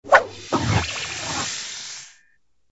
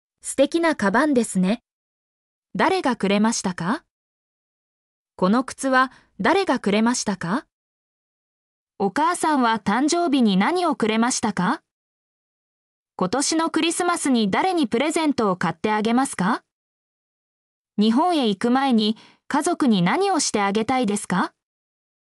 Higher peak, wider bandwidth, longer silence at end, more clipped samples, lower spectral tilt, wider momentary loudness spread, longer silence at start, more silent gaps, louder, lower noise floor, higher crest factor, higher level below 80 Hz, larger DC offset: first, 0 dBFS vs -8 dBFS; second, 8 kHz vs 13.5 kHz; second, 0.65 s vs 0.85 s; neither; about the same, -3.5 dB/octave vs -4.5 dB/octave; first, 17 LU vs 7 LU; second, 0.05 s vs 0.25 s; second, none vs 1.72-2.43 s, 3.91-5.06 s, 7.52-8.67 s, 11.71-12.86 s, 16.52-17.65 s; about the same, -23 LUFS vs -21 LUFS; second, -66 dBFS vs under -90 dBFS; first, 24 dB vs 16 dB; first, -44 dBFS vs -62 dBFS; neither